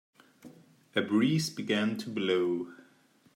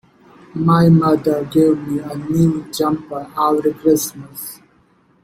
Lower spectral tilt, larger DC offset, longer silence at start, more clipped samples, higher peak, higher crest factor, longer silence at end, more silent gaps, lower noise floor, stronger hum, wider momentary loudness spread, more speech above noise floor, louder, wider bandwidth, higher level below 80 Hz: second, -5.5 dB/octave vs -7 dB/octave; neither; about the same, 0.45 s vs 0.55 s; neither; second, -14 dBFS vs -2 dBFS; about the same, 18 dB vs 16 dB; about the same, 0.6 s vs 0.7 s; neither; first, -64 dBFS vs -55 dBFS; neither; second, 7 LU vs 17 LU; second, 35 dB vs 39 dB; second, -30 LUFS vs -16 LUFS; about the same, 16 kHz vs 16.5 kHz; second, -76 dBFS vs -52 dBFS